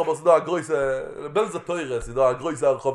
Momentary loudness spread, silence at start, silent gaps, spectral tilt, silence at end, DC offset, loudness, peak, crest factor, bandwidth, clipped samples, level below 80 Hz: 9 LU; 0 s; none; -5.5 dB/octave; 0 s; under 0.1%; -23 LUFS; -4 dBFS; 20 dB; 11.5 kHz; under 0.1%; -48 dBFS